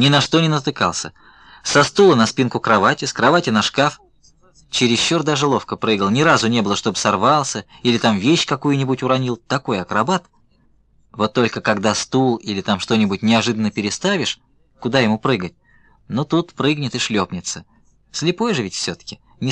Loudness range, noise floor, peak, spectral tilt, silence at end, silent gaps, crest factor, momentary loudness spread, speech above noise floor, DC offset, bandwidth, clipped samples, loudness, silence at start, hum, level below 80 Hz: 5 LU; -56 dBFS; -2 dBFS; -4.5 dB/octave; 0 s; none; 16 dB; 10 LU; 39 dB; under 0.1%; 10.5 kHz; under 0.1%; -18 LUFS; 0 s; none; -54 dBFS